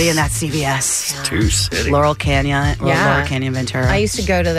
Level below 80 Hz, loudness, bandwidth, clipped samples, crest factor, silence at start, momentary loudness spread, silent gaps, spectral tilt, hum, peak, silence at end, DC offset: -28 dBFS; -16 LUFS; 16 kHz; under 0.1%; 12 dB; 0 s; 3 LU; none; -4 dB/octave; none; -4 dBFS; 0 s; under 0.1%